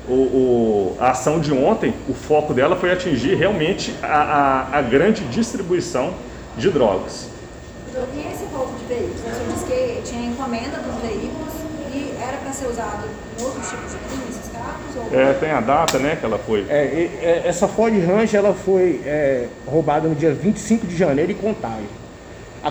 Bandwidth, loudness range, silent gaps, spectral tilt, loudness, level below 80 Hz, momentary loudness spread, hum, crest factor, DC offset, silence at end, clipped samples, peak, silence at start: over 20 kHz; 8 LU; none; -5.5 dB/octave; -20 LUFS; -42 dBFS; 12 LU; none; 16 dB; under 0.1%; 0 s; under 0.1%; -2 dBFS; 0 s